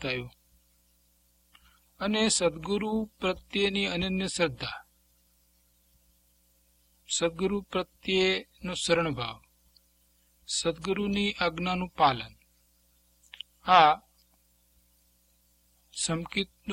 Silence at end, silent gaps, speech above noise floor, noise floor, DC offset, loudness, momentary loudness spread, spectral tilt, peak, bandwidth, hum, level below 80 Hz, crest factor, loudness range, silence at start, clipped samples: 0 s; none; 39 dB; -67 dBFS; under 0.1%; -28 LUFS; 13 LU; -3.5 dB/octave; -6 dBFS; 16.5 kHz; 60 Hz at -55 dBFS; -56 dBFS; 24 dB; 6 LU; 0 s; under 0.1%